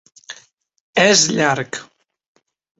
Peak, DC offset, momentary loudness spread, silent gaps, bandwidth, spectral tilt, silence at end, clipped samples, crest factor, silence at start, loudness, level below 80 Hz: 0 dBFS; under 0.1%; 25 LU; 0.80-0.93 s; 8.2 kHz; -2.5 dB/octave; 0.95 s; under 0.1%; 20 dB; 0.3 s; -15 LUFS; -60 dBFS